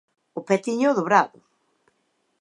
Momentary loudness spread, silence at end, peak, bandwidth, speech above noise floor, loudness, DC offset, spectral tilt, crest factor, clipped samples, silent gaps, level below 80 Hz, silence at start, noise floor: 17 LU; 1.15 s; -2 dBFS; 11 kHz; 50 dB; -22 LUFS; under 0.1%; -5.5 dB/octave; 22 dB; under 0.1%; none; -80 dBFS; 0.35 s; -71 dBFS